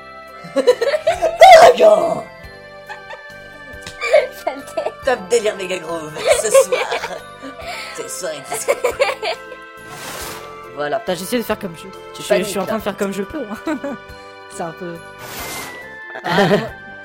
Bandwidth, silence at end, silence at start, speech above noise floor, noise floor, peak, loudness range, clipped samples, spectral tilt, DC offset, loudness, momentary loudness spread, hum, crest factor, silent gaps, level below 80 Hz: 16.5 kHz; 0 s; 0 s; 21 dB; -37 dBFS; 0 dBFS; 11 LU; under 0.1%; -3.5 dB/octave; under 0.1%; -16 LUFS; 21 LU; none; 18 dB; none; -48 dBFS